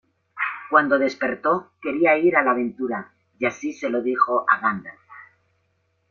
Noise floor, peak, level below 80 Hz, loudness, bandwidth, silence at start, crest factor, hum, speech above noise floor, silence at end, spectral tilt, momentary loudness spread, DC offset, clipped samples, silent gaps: -69 dBFS; -2 dBFS; -68 dBFS; -21 LUFS; 7 kHz; 0.35 s; 20 dB; none; 48 dB; 0.9 s; -6 dB/octave; 11 LU; under 0.1%; under 0.1%; none